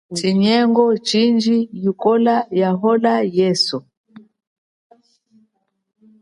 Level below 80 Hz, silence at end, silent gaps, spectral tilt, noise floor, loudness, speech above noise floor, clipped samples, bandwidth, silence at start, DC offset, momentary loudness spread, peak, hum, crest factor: -64 dBFS; 2 s; 3.97-4.04 s; -5.5 dB/octave; -67 dBFS; -16 LUFS; 51 dB; under 0.1%; 11.5 kHz; 0.1 s; under 0.1%; 5 LU; -2 dBFS; none; 16 dB